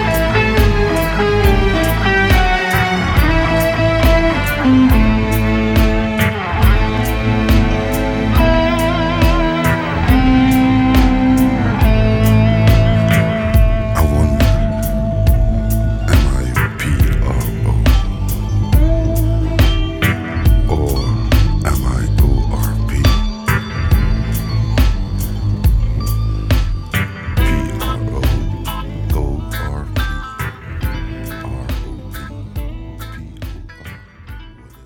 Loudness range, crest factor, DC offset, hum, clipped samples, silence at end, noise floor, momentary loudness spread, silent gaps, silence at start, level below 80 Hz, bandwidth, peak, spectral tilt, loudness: 10 LU; 12 dB; under 0.1%; none; under 0.1%; 0.35 s; -36 dBFS; 12 LU; none; 0 s; -18 dBFS; over 20 kHz; -2 dBFS; -6.5 dB/octave; -15 LUFS